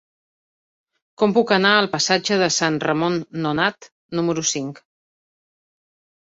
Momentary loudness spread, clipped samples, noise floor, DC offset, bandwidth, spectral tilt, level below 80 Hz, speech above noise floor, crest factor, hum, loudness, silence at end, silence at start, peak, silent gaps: 8 LU; under 0.1%; under -90 dBFS; under 0.1%; 8 kHz; -3.5 dB/octave; -62 dBFS; over 70 dB; 20 dB; none; -19 LUFS; 1.45 s; 1.2 s; -2 dBFS; 3.92-4.09 s